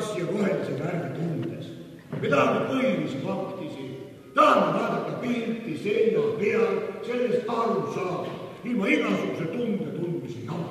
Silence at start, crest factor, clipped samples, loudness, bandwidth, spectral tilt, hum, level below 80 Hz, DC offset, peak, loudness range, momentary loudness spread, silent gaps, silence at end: 0 s; 20 dB; under 0.1%; -26 LUFS; 14 kHz; -6.5 dB/octave; none; -68 dBFS; under 0.1%; -6 dBFS; 3 LU; 13 LU; none; 0 s